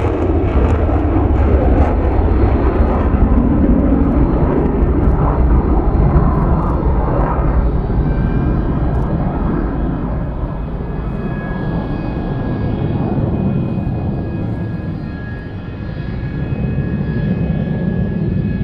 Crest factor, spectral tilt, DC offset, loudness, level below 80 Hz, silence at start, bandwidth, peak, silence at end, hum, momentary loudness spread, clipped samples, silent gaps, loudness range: 14 dB; -11 dB/octave; under 0.1%; -17 LUFS; -18 dBFS; 0 s; 4.9 kHz; 0 dBFS; 0 s; none; 9 LU; under 0.1%; none; 7 LU